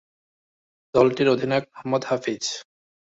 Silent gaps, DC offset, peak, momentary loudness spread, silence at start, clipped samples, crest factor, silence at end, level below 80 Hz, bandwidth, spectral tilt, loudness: none; under 0.1%; -4 dBFS; 10 LU; 0.95 s; under 0.1%; 20 dB; 0.45 s; -62 dBFS; 8 kHz; -5 dB/octave; -23 LUFS